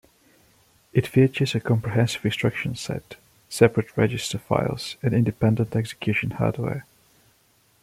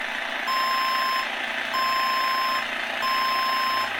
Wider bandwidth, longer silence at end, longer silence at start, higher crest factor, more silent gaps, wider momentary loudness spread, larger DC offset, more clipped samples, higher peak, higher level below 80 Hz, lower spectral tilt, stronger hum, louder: second, 15 kHz vs 17 kHz; first, 1 s vs 0 s; first, 0.95 s vs 0 s; first, 22 dB vs 14 dB; neither; first, 10 LU vs 4 LU; neither; neither; first, -2 dBFS vs -12 dBFS; first, -54 dBFS vs -64 dBFS; first, -6 dB/octave vs -0.5 dB/octave; neither; about the same, -24 LUFS vs -24 LUFS